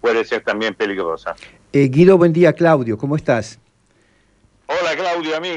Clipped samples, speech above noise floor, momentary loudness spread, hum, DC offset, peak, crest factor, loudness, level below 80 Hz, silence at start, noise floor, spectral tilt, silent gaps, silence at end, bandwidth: under 0.1%; 41 dB; 13 LU; none; under 0.1%; 0 dBFS; 16 dB; -16 LUFS; -52 dBFS; 0.05 s; -57 dBFS; -7 dB/octave; none; 0 s; 10 kHz